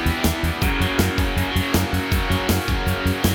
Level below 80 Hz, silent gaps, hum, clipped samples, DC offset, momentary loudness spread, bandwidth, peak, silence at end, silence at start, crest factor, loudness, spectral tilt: -28 dBFS; none; none; under 0.1%; under 0.1%; 2 LU; over 20 kHz; -8 dBFS; 0 s; 0 s; 12 dB; -21 LUFS; -5 dB/octave